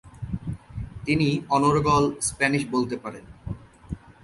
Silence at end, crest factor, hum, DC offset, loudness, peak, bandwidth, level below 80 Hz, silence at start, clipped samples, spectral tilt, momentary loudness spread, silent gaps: 0.15 s; 20 dB; none; under 0.1%; -24 LUFS; -6 dBFS; 11.5 kHz; -44 dBFS; 0.05 s; under 0.1%; -5 dB/octave; 19 LU; none